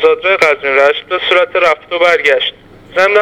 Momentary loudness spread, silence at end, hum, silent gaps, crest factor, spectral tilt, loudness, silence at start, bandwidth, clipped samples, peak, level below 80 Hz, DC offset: 5 LU; 0 s; none; none; 12 dB; -2.5 dB/octave; -11 LUFS; 0 s; 13 kHz; 0.2%; 0 dBFS; -52 dBFS; under 0.1%